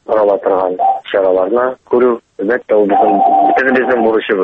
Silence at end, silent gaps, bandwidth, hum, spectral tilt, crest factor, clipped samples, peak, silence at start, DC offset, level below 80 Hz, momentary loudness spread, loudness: 0 s; none; 5.8 kHz; none; -7.5 dB/octave; 12 dB; under 0.1%; 0 dBFS; 0.1 s; under 0.1%; -54 dBFS; 5 LU; -12 LUFS